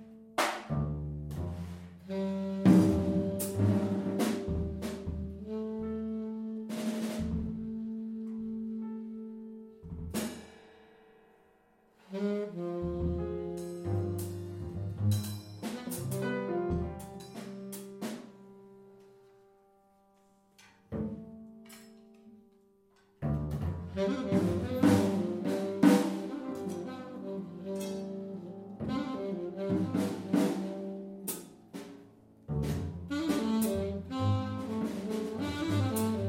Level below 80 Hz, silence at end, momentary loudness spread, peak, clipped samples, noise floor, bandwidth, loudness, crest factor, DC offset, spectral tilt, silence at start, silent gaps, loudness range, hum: -52 dBFS; 0 s; 16 LU; -10 dBFS; under 0.1%; -66 dBFS; 16 kHz; -34 LUFS; 24 dB; under 0.1%; -6.5 dB/octave; 0 s; none; 16 LU; none